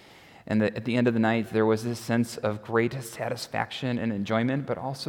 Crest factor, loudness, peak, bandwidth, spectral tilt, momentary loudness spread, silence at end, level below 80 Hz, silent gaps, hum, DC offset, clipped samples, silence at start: 18 dB; -27 LUFS; -10 dBFS; 17.5 kHz; -6 dB/octave; 7 LU; 0 s; -66 dBFS; none; none; under 0.1%; under 0.1%; 0.15 s